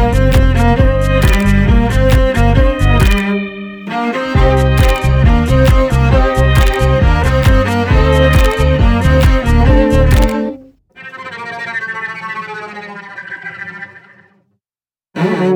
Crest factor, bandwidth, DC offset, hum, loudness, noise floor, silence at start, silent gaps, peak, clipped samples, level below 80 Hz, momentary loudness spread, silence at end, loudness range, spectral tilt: 10 dB; over 20 kHz; under 0.1%; none; -12 LUFS; under -90 dBFS; 0 s; none; 0 dBFS; under 0.1%; -14 dBFS; 16 LU; 0 s; 13 LU; -7 dB/octave